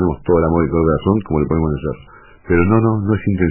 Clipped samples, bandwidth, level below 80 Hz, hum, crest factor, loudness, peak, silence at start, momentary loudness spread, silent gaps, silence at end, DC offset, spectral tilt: under 0.1%; 3.1 kHz; -32 dBFS; none; 14 dB; -16 LUFS; -2 dBFS; 0 s; 7 LU; none; 0 s; under 0.1%; -13 dB/octave